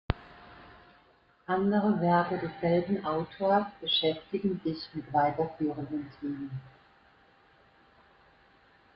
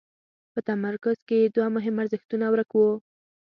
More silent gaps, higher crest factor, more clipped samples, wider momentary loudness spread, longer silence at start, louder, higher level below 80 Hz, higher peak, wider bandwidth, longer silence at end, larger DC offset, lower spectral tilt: second, none vs 1.22-1.27 s, 2.25-2.29 s; first, 22 dB vs 16 dB; neither; first, 13 LU vs 8 LU; second, 0.1 s vs 0.55 s; second, -30 LUFS vs -25 LUFS; first, -56 dBFS vs -72 dBFS; about the same, -10 dBFS vs -10 dBFS; about the same, 5.6 kHz vs 5.4 kHz; first, 2.25 s vs 0.4 s; neither; about the same, -9.5 dB/octave vs -9 dB/octave